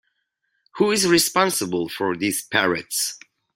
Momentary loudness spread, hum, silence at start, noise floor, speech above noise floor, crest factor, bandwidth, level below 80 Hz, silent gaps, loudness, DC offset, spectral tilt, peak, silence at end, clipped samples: 9 LU; none; 0.75 s; -73 dBFS; 52 dB; 20 dB; 16.5 kHz; -62 dBFS; none; -21 LUFS; under 0.1%; -2.5 dB/octave; -2 dBFS; 0.4 s; under 0.1%